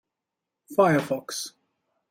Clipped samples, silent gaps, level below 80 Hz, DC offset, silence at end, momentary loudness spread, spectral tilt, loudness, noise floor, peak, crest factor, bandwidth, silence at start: under 0.1%; none; -70 dBFS; under 0.1%; 0.6 s; 13 LU; -5 dB/octave; -25 LUFS; -86 dBFS; -8 dBFS; 20 dB; 16.5 kHz; 0.7 s